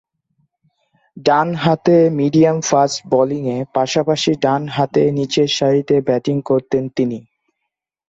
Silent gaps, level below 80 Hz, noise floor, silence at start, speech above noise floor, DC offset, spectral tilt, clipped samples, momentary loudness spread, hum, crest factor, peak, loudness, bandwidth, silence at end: none; -56 dBFS; -78 dBFS; 1.15 s; 63 dB; under 0.1%; -5.5 dB/octave; under 0.1%; 7 LU; none; 14 dB; -2 dBFS; -16 LUFS; 8 kHz; 0.9 s